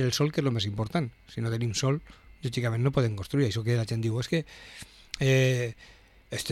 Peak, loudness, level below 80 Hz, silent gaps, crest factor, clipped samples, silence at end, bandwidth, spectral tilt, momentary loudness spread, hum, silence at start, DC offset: -10 dBFS; -28 LUFS; -54 dBFS; none; 18 dB; under 0.1%; 0 s; 14.5 kHz; -5.5 dB/octave; 13 LU; none; 0 s; under 0.1%